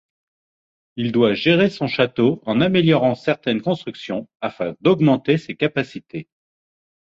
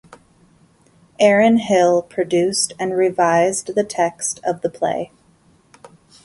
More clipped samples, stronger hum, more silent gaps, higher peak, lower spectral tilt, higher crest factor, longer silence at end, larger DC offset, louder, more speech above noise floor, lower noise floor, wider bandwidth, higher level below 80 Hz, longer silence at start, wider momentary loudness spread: neither; neither; first, 4.35-4.40 s vs none; about the same, -2 dBFS vs 0 dBFS; first, -7.5 dB/octave vs -4 dB/octave; about the same, 18 dB vs 18 dB; second, 0.9 s vs 1.2 s; neither; about the same, -19 LUFS vs -18 LUFS; first, over 71 dB vs 38 dB; first, under -90 dBFS vs -55 dBFS; second, 7.6 kHz vs 11.5 kHz; about the same, -58 dBFS vs -62 dBFS; second, 0.95 s vs 1.2 s; first, 13 LU vs 8 LU